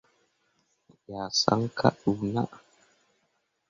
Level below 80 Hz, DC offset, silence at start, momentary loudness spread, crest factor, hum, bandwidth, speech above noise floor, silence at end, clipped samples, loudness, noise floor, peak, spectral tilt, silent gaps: -62 dBFS; under 0.1%; 1.1 s; 13 LU; 26 dB; none; 7.6 kHz; 48 dB; 1.1 s; under 0.1%; -27 LUFS; -75 dBFS; -4 dBFS; -5 dB/octave; none